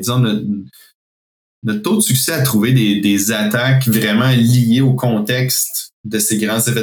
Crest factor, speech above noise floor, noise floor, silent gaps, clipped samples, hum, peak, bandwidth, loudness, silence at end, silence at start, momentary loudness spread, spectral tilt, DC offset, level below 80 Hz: 14 dB; over 75 dB; under -90 dBFS; 0.94-1.62 s, 5.93-6.04 s; under 0.1%; none; -2 dBFS; 19.5 kHz; -15 LUFS; 0 s; 0 s; 9 LU; -4.5 dB/octave; under 0.1%; -58 dBFS